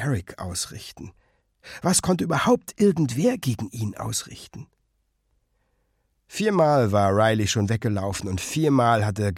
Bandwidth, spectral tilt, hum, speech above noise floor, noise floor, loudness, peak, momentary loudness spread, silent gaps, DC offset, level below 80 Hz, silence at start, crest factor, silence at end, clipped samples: 16 kHz; -5 dB/octave; none; 48 dB; -71 dBFS; -23 LUFS; -6 dBFS; 17 LU; none; under 0.1%; -52 dBFS; 0 s; 18 dB; 0 s; under 0.1%